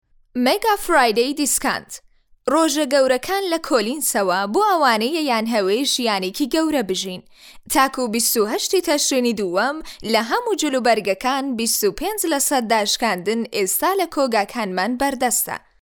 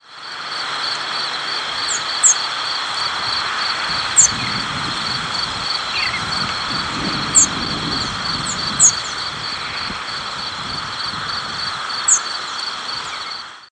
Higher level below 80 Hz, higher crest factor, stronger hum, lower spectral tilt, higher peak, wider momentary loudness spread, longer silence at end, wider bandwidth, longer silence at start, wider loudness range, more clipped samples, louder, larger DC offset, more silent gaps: about the same, -52 dBFS vs -48 dBFS; about the same, 16 dB vs 20 dB; neither; first, -2 dB/octave vs 0 dB/octave; second, -4 dBFS vs 0 dBFS; second, 5 LU vs 12 LU; first, 0.25 s vs 0.05 s; first, over 20 kHz vs 11 kHz; first, 0.35 s vs 0.05 s; second, 1 LU vs 4 LU; neither; about the same, -19 LUFS vs -18 LUFS; neither; neither